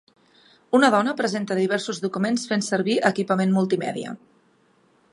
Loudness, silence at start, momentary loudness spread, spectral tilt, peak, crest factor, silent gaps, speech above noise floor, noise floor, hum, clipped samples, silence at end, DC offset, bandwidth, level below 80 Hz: -22 LUFS; 0.7 s; 10 LU; -5 dB/octave; -2 dBFS; 20 dB; none; 39 dB; -61 dBFS; none; under 0.1%; 0.95 s; under 0.1%; 11.5 kHz; -74 dBFS